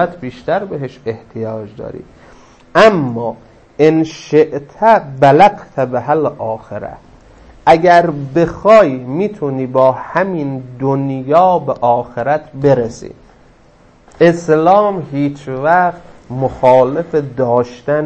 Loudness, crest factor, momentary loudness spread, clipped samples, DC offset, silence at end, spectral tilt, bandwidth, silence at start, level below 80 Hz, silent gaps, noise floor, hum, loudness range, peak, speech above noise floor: -13 LUFS; 14 dB; 15 LU; 0.1%; under 0.1%; 0 s; -7 dB/octave; 8.6 kHz; 0 s; -46 dBFS; none; -46 dBFS; none; 3 LU; 0 dBFS; 33 dB